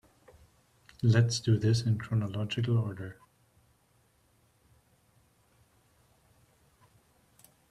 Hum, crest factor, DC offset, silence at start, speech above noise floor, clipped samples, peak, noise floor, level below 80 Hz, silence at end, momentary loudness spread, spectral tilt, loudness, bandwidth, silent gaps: none; 22 dB; under 0.1%; 1.05 s; 41 dB; under 0.1%; -12 dBFS; -68 dBFS; -62 dBFS; 4.6 s; 11 LU; -6 dB/octave; -29 LUFS; 11 kHz; none